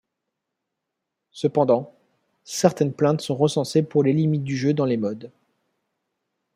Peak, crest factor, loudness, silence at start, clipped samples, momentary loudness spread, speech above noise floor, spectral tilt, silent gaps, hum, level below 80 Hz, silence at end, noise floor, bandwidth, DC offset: -2 dBFS; 22 dB; -22 LUFS; 1.35 s; under 0.1%; 8 LU; 61 dB; -6.5 dB/octave; none; none; -68 dBFS; 1.3 s; -82 dBFS; 15 kHz; under 0.1%